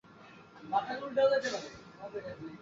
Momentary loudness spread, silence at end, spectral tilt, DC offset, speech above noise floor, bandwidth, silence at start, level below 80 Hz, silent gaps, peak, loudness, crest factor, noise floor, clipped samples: 23 LU; 0 s; -4 dB/octave; under 0.1%; 22 dB; 7.8 kHz; 0.1 s; -70 dBFS; none; -16 dBFS; -33 LUFS; 18 dB; -55 dBFS; under 0.1%